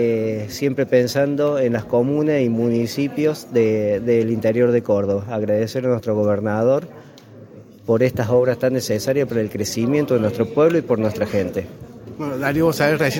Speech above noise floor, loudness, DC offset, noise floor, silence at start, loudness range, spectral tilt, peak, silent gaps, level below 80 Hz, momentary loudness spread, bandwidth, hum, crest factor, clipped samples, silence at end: 23 dB; -19 LUFS; under 0.1%; -42 dBFS; 0 s; 2 LU; -6.5 dB/octave; -2 dBFS; none; -54 dBFS; 6 LU; 17 kHz; none; 16 dB; under 0.1%; 0 s